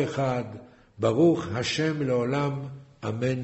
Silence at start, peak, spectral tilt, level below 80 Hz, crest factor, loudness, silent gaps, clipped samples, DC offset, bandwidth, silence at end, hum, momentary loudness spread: 0 s; -10 dBFS; -6.5 dB/octave; -58 dBFS; 18 dB; -26 LUFS; none; under 0.1%; under 0.1%; 8.2 kHz; 0 s; none; 15 LU